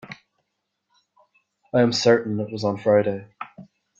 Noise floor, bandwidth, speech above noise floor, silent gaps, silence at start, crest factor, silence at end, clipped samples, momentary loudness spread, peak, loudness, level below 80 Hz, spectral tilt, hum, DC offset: -78 dBFS; 7.8 kHz; 57 dB; none; 0.05 s; 18 dB; 0.4 s; under 0.1%; 20 LU; -6 dBFS; -21 LUFS; -64 dBFS; -5.5 dB/octave; none; under 0.1%